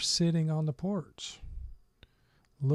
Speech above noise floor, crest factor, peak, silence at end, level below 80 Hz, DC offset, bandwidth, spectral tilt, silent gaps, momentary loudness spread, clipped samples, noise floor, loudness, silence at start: 37 dB; 14 dB; -18 dBFS; 0 s; -50 dBFS; under 0.1%; 12 kHz; -5 dB/octave; none; 21 LU; under 0.1%; -68 dBFS; -32 LUFS; 0 s